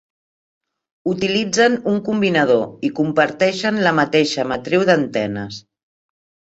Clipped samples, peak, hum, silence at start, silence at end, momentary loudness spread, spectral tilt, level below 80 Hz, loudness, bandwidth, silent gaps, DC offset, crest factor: under 0.1%; -2 dBFS; none; 1.05 s; 0.9 s; 9 LU; -5 dB/octave; -56 dBFS; -18 LUFS; 8.2 kHz; none; under 0.1%; 18 dB